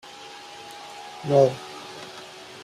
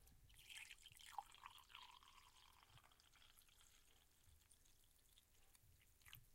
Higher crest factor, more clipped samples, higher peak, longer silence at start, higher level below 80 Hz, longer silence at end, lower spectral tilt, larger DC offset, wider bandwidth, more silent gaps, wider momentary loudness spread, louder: second, 22 dB vs 30 dB; neither; first, -6 dBFS vs -36 dBFS; first, 0.15 s vs 0 s; first, -68 dBFS vs -78 dBFS; about the same, 0 s vs 0 s; first, -6 dB/octave vs -0.5 dB/octave; neither; second, 13.5 kHz vs 16 kHz; neither; first, 21 LU vs 12 LU; first, -22 LUFS vs -62 LUFS